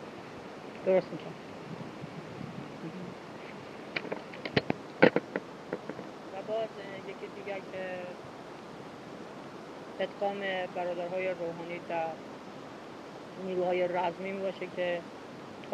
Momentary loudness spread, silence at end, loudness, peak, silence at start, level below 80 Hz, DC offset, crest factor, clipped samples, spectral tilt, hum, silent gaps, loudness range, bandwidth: 15 LU; 0 s; -36 LUFS; -4 dBFS; 0 s; -72 dBFS; under 0.1%; 32 dB; under 0.1%; -6 dB/octave; none; none; 8 LU; 12.5 kHz